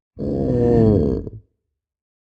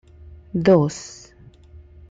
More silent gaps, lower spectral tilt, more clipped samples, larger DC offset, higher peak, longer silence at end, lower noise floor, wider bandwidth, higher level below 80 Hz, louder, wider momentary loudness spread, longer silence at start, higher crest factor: neither; first, -11 dB/octave vs -7 dB/octave; neither; neither; about the same, -2 dBFS vs -4 dBFS; about the same, 0.9 s vs 1 s; first, -78 dBFS vs -48 dBFS; second, 7.6 kHz vs 9 kHz; first, -34 dBFS vs -48 dBFS; about the same, -18 LUFS vs -19 LUFS; second, 12 LU vs 23 LU; second, 0.15 s vs 0.55 s; about the same, 18 dB vs 20 dB